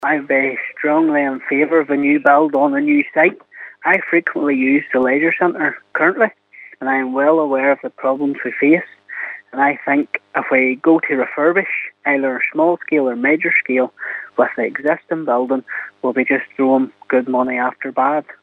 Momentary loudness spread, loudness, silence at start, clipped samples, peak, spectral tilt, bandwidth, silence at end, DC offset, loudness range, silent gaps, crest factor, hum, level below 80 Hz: 7 LU; -16 LUFS; 0 s; under 0.1%; 0 dBFS; -8.5 dB/octave; 4 kHz; 0.1 s; under 0.1%; 3 LU; none; 16 dB; none; -72 dBFS